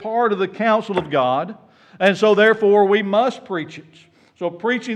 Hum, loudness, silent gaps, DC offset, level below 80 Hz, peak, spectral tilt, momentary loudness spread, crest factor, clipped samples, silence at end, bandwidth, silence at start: none; -18 LUFS; none; under 0.1%; -66 dBFS; -4 dBFS; -6 dB/octave; 14 LU; 16 dB; under 0.1%; 0 s; 8.8 kHz; 0 s